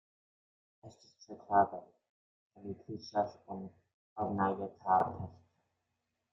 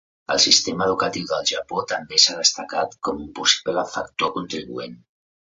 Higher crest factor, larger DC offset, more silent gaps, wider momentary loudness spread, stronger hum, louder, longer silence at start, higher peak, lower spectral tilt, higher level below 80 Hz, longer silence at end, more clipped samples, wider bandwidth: about the same, 24 dB vs 22 dB; neither; first, 2.09-2.50 s, 3.94-4.16 s vs none; first, 21 LU vs 15 LU; neither; second, -35 LUFS vs -20 LUFS; first, 0.85 s vs 0.3 s; second, -14 dBFS vs 0 dBFS; first, -5.5 dB/octave vs -1 dB/octave; second, -74 dBFS vs -56 dBFS; first, 0.95 s vs 0.45 s; neither; about the same, 7.4 kHz vs 8 kHz